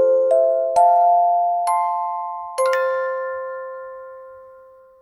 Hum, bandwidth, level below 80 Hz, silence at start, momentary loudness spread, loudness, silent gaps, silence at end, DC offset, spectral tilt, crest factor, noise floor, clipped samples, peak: none; 15.5 kHz; -68 dBFS; 0 s; 18 LU; -18 LUFS; none; 0.5 s; under 0.1%; -2 dB/octave; 14 dB; -46 dBFS; under 0.1%; -4 dBFS